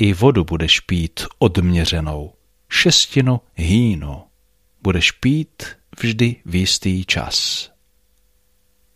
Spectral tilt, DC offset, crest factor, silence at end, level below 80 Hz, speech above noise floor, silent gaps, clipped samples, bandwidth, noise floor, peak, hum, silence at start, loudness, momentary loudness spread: -4.5 dB/octave; under 0.1%; 18 dB; 1.3 s; -34 dBFS; 44 dB; none; under 0.1%; 15.5 kHz; -62 dBFS; -2 dBFS; none; 0 s; -17 LUFS; 16 LU